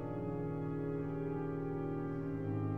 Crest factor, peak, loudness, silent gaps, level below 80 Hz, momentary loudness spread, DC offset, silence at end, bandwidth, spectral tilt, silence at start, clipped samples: 12 dB; -26 dBFS; -39 LUFS; none; -56 dBFS; 1 LU; under 0.1%; 0 s; 3.8 kHz; -11 dB/octave; 0 s; under 0.1%